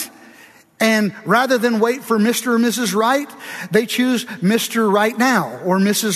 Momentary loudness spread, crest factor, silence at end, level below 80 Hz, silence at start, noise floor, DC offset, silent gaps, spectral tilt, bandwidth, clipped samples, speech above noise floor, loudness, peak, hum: 4 LU; 16 dB; 0 s; -68 dBFS; 0 s; -46 dBFS; under 0.1%; none; -4 dB/octave; 14 kHz; under 0.1%; 29 dB; -17 LUFS; -2 dBFS; none